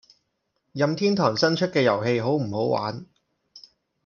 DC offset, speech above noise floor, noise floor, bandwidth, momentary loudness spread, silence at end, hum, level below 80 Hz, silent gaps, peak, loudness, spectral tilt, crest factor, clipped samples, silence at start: under 0.1%; 53 dB; -75 dBFS; 7.2 kHz; 9 LU; 0.45 s; none; -68 dBFS; none; -6 dBFS; -23 LUFS; -6 dB/octave; 20 dB; under 0.1%; 0.75 s